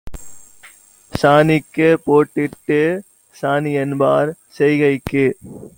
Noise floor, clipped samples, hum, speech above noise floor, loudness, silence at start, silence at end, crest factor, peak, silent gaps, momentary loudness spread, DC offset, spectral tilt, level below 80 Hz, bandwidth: -46 dBFS; under 0.1%; none; 30 dB; -16 LUFS; 0.05 s; 0.1 s; 16 dB; 0 dBFS; none; 11 LU; under 0.1%; -7 dB/octave; -46 dBFS; 17 kHz